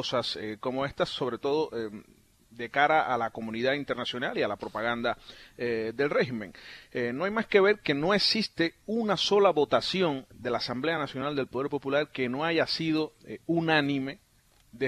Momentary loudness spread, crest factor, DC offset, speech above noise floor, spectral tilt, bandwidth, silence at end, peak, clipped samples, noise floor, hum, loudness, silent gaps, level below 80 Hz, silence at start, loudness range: 12 LU; 22 dB; under 0.1%; 33 dB; -5 dB/octave; 13.5 kHz; 0 s; -8 dBFS; under 0.1%; -61 dBFS; none; -28 LUFS; none; -62 dBFS; 0 s; 5 LU